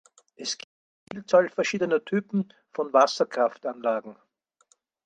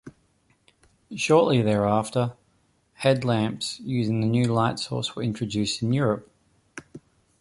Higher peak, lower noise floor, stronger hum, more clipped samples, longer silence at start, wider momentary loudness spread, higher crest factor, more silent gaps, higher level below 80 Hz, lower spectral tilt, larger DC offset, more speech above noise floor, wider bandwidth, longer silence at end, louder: about the same, -6 dBFS vs -6 dBFS; about the same, -67 dBFS vs -66 dBFS; neither; neither; first, 0.4 s vs 0.05 s; first, 14 LU vs 11 LU; about the same, 22 dB vs 20 dB; first, 0.64-1.07 s vs none; second, -76 dBFS vs -56 dBFS; second, -4.5 dB/octave vs -6 dB/octave; neither; about the same, 41 dB vs 42 dB; second, 9.2 kHz vs 11.5 kHz; first, 0.95 s vs 0.4 s; about the same, -26 LUFS vs -24 LUFS